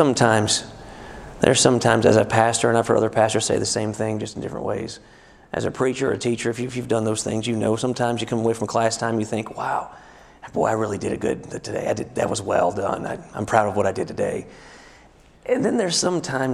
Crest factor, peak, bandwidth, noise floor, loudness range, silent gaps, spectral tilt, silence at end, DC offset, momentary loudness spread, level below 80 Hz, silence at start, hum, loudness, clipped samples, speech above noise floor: 22 dB; 0 dBFS; 13.5 kHz; -51 dBFS; 7 LU; none; -4.5 dB/octave; 0 s; under 0.1%; 13 LU; -52 dBFS; 0 s; none; -22 LUFS; under 0.1%; 29 dB